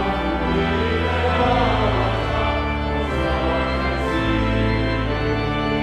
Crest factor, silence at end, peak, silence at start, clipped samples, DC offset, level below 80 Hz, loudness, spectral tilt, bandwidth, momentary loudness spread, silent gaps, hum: 14 dB; 0 s; -6 dBFS; 0 s; under 0.1%; under 0.1%; -28 dBFS; -21 LUFS; -7 dB/octave; 11 kHz; 4 LU; none; none